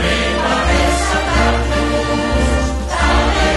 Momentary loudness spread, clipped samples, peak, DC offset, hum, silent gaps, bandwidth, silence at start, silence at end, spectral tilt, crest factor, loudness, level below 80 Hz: 3 LU; under 0.1%; -2 dBFS; under 0.1%; none; none; 12 kHz; 0 s; 0 s; -4.5 dB/octave; 12 dB; -15 LUFS; -20 dBFS